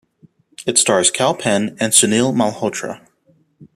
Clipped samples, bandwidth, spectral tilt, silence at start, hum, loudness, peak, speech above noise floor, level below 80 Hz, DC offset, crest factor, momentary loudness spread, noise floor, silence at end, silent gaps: under 0.1%; 15 kHz; -2.5 dB/octave; 0.6 s; none; -15 LUFS; 0 dBFS; 41 dB; -60 dBFS; under 0.1%; 18 dB; 14 LU; -58 dBFS; 0.1 s; none